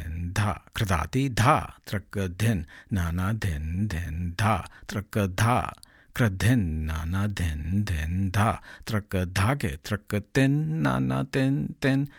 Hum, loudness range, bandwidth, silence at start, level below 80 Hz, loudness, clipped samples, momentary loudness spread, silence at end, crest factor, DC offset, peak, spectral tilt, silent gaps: none; 2 LU; 17.5 kHz; 0 s; -42 dBFS; -27 LUFS; under 0.1%; 8 LU; 0.1 s; 20 dB; under 0.1%; -6 dBFS; -6 dB/octave; none